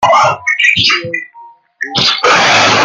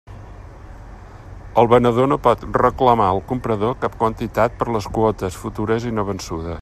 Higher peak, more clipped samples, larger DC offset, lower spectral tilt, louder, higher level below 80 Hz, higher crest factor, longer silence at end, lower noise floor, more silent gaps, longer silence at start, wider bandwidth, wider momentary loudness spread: about the same, 0 dBFS vs 0 dBFS; neither; neither; second, -2 dB/octave vs -7 dB/octave; first, -9 LUFS vs -19 LUFS; second, -52 dBFS vs -38 dBFS; second, 12 dB vs 18 dB; about the same, 0 s vs 0 s; about the same, -38 dBFS vs -38 dBFS; neither; about the same, 0 s vs 0.1 s; about the same, 15.5 kHz vs 14.5 kHz; about the same, 13 LU vs 12 LU